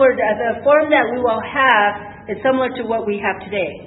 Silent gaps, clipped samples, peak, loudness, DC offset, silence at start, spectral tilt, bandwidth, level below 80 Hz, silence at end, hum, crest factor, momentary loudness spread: none; under 0.1%; 0 dBFS; -17 LUFS; under 0.1%; 0 s; -8 dB/octave; 4.1 kHz; -52 dBFS; 0 s; none; 16 dB; 9 LU